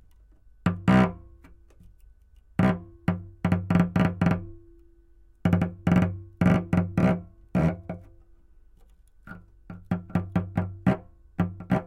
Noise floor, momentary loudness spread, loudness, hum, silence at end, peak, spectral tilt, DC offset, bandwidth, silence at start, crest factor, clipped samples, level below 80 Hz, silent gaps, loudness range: -55 dBFS; 19 LU; -26 LUFS; none; 0 s; -8 dBFS; -8.5 dB/octave; under 0.1%; 8.2 kHz; 0.65 s; 20 dB; under 0.1%; -48 dBFS; none; 6 LU